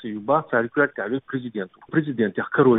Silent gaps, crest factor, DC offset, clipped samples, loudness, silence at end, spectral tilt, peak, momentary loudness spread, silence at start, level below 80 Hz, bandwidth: none; 18 dB; under 0.1%; under 0.1%; -24 LUFS; 0 s; -11.5 dB/octave; -6 dBFS; 9 LU; 0 s; -68 dBFS; 4 kHz